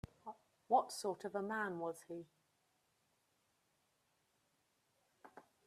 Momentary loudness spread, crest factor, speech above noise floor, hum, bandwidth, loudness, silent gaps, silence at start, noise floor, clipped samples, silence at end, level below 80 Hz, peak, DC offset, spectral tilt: 24 LU; 24 dB; 40 dB; none; 14 kHz; -40 LUFS; none; 0.25 s; -81 dBFS; under 0.1%; 0.25 s; -78 dBFS; -22 dBFS; under 0.1%; -4.5 dB/octave